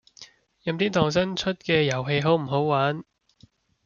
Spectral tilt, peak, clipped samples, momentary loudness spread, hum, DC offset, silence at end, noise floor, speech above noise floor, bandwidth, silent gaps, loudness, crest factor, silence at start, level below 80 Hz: -5.5 dB/octave; -8 dBFS; under 0.1%; 7 LU; none; under 0.1%; 0.85 s; -59 dBFS; 35 dB; 7.2 kHz; none; -24 LUFS; 18 dB; 0.2 s; -58 dBFS